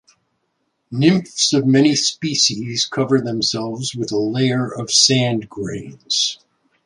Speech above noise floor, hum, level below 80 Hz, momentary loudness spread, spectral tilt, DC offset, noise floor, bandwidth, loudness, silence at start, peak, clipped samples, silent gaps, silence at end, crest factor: 52 dB; none; -58 dBFS; 12 LU; -3.5 dB/octave; under 0.1%; -70 dBFS; 11.5 kHz; -17 LUFS; 0.9 s; -2 dBFS; under 0.1%; none; 0.5 s; 18 dB